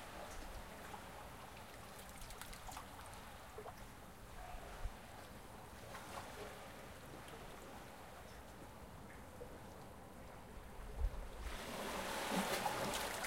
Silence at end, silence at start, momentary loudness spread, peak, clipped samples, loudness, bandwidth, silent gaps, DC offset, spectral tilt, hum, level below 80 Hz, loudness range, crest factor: 0 s; 0 s; 15 LU; -26 dBFS; under 0.1%; -49 LUFS; 16 kHz; none; under 0.1%; -3.5 dB/octave; none; -54 dBFS; 10 LU; 22 dB